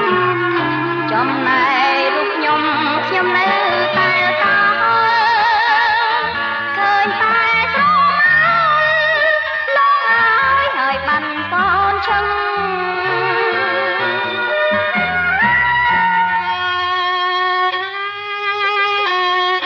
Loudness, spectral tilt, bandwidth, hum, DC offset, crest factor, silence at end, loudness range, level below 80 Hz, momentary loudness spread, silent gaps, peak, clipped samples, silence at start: -14 LUFS; -5 dB/octave; 7 kHz; none; under 0.1%; 12 dB; 0 s; 4 LU; -48 dBFS; 6 LU; none; -4 dBFS; under 0.1%; 0 s